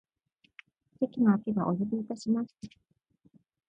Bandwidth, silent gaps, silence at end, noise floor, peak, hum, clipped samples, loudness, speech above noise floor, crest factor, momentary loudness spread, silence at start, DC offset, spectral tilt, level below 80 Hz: 8.2 kHz; none; 1 s; -72 dBFS; -14 dBFS; none; under 0.1%; -30 LUFS; 43 dB; 18 dB; 16 LU; 1 s; under 0.1%; -8.5 dB/octave; -70 dBFS